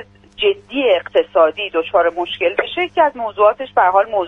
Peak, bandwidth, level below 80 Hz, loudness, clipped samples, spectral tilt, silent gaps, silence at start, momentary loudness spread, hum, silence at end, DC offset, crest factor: -2 dBFS; 4 kHz; -54 dBFS; -16 LUFS; under 0.1%; -5.5 dB/octave; none; 0 s; 5 LU; 50 Hz at -55 dBFS; 0 s; under 0.1%; 16 dB